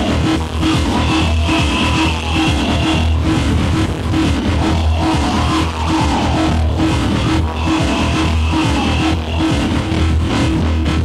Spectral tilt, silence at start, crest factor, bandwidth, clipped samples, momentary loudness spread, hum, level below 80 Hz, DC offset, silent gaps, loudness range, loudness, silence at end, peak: -5.5 dB/octave; 0 s; 12 dB; 12.5 kHz; under 0.1%; 2 LU; none; -22 dBFS; under 0.1%; none; 1 LU; -15 LUFS; 0 s; -2 dBFS